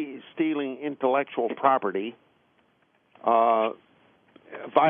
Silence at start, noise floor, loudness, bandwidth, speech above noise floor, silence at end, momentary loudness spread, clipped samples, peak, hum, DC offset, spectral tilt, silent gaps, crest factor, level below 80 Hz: 0 s; -66 dBFS; -26 LUFS; 3.8 kHz; 42 dB; 0 s; 15 LU; under 0.1%; -4 dBFS; none; under 0.1%; -3.5 dB/octave; none; 22 dB; -84 dBFS